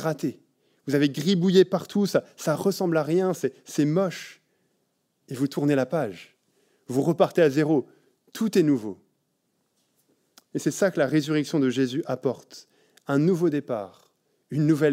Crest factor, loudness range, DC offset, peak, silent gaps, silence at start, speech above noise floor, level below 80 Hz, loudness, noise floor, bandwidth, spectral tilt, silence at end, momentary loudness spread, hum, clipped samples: 20 dB; 5 LU; under 0.1%; -6 dBFS; none; 0 s; 50 dB; -78 dBFS; -24 LUFS; -73 dBFS; 16 kHz; -6.5 dB/octave; 0 s; 15 LU; none; under 0.1%